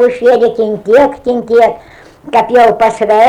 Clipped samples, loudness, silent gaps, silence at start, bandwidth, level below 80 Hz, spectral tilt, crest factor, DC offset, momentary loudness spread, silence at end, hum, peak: under 0.1%; -10 LUFS; none; 0 s; 11 kHz; -46 dBFS; -5.5 dB/octave; 10 dB; under 0.1%; 7 LU; 0 s; none; 0 dBFS